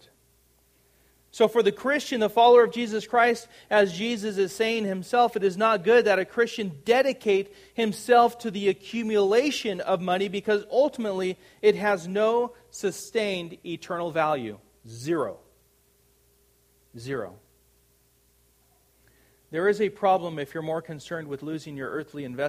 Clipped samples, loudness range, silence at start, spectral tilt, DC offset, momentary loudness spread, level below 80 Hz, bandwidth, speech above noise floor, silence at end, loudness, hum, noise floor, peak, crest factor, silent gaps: under 0.1%; 13 LU; 1.35 s; -4.5 dB/octave; under 0.1%; 14 LU; -68 dBFS; 15.5 kHz; 39 dB; 0 s; -25 LUFS; none; -64 dBFS; -6 dBFS; 20 dB; none